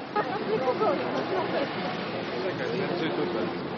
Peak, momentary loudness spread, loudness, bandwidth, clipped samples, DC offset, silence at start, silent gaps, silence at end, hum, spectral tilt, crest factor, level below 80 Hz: -12 dBFS; 5 LU; -29 LUFS; 6.6 kHz; under 0.1%; under 0.1%; 0 s; none; 0 s; none; -4 dB/octave; 16 dB; -66 dBFS